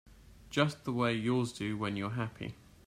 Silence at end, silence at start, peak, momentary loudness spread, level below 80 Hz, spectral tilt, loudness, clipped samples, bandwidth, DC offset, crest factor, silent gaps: 0.3 s; 0.05 s; -12 dBFS; 8 LU; -62 dBFS; -6 dB/octave; -34 LUFS; under 0.1%; 14.5 kHz; under 0.1%; 22 dB; none